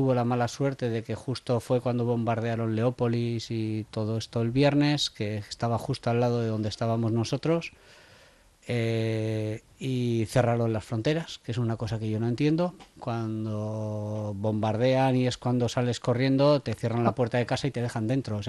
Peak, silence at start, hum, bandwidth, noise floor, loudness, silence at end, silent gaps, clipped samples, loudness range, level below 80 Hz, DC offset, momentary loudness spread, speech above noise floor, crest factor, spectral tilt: -10 dBFS; 0 s; none; 12 kHz; -57 dBFS; -28 LUFS; 0 s; none; under 0.1%; 4 LU; -58 dBFS; under 0.1%; 9 LU; 30 dB; 18 dB; -6.5 dB/octave